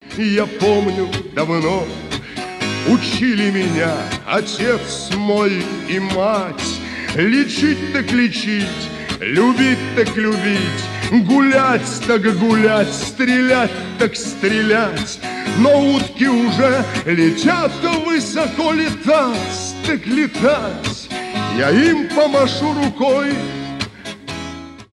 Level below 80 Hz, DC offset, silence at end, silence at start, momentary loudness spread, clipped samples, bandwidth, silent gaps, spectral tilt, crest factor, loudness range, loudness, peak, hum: -46 dBFS; under 0.1%; 0.1 s; 0.05 s; 10 LU; under 0.1%; 12 kHz; none; -5 dB/octave; 14 dB; 3 LU; -17 LUFS; -2 dBFS; none